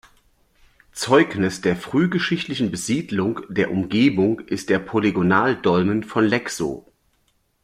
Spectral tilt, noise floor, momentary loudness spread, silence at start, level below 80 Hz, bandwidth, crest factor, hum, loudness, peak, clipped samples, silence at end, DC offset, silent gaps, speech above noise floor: -5.5 dB/octave; -65 dBFS; 9 LU; 0.95 s; -56 dBFS; 15.5 kHz; 18 dB; none; -21 LUFS; -2 dBFS; under 0.1%; 0.85 s; under 0.1%; none; 45 dB